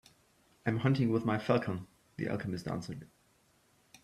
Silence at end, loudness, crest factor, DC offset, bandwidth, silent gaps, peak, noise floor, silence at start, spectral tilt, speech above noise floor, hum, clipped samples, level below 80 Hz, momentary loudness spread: 1 s; -34 LUFS; 22 dB; under 0.1%; 13 kHz; none; -14 dBFS; -69 dBFS; 0.65 s; -7.5 dB/octave; 37 dB; none; under 0.1%; -66 dBFS; 14 LU